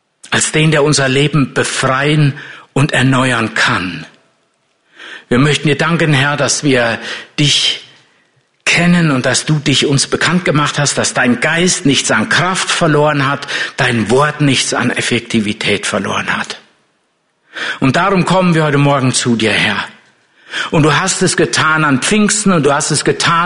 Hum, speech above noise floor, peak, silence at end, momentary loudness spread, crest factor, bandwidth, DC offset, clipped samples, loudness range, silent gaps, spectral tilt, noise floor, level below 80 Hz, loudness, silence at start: none; 49 dB; 0 dBFS; 0 s; 7 LU; 12 dB; 11 kHz; under 0.1%; under 0.1%; 3 LU; none; -4 dB/octave; -61 dBFS; -44 dBFS; -12 LUFS; 0.25 s